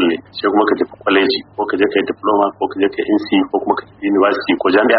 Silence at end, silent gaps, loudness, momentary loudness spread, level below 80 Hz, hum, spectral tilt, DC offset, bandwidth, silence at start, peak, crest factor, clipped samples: 0 s; none; -16 LUFS; 5 LU; -56 dBFS; none; -2 dB/octave; under 0.1%; 5.4 kHz; 0 s; 0 dBFS; 16 dB; under 0.1%